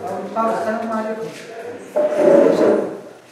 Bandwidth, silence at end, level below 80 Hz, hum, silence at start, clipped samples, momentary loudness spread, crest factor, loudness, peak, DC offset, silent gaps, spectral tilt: 13 kHz; 0.15 s; -70 dBFS; none; 0 s; under 0.1%; 20 LU; 18 dB; -18 LUFS; -2 dBFS; under 0.1%; none; -6.5 dB/octave